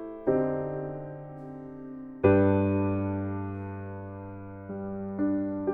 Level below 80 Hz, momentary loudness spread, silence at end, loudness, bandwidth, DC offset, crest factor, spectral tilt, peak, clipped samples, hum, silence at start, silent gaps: -56 dBFS; 19 LU; 0 s; -29 LUFS; 3.7 kHz; under 0.1%; 20 dB; -12 dB/octave; -8 dBFS; under 0.1%; none; 0 s; none